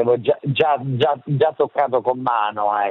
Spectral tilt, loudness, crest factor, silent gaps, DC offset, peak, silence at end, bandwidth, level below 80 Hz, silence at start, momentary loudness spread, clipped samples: -8.5 dB/octave; -19 LUFS; 14 dB; none; under 0.1%; -4 dBFS; 0 s; 4.7 kHz; -66 dBFS; 0 s; 2 LU; under 0.1%